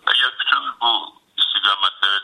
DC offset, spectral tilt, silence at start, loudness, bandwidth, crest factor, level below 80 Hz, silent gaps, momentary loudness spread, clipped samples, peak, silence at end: under 0.1%; 1 dB/octave; 0.05 s; -17 LUFS; 11.5 kHz; 18 dB; -74 dBFS; none; 4 LU; under 0.1%; -2 dBFS; 0 s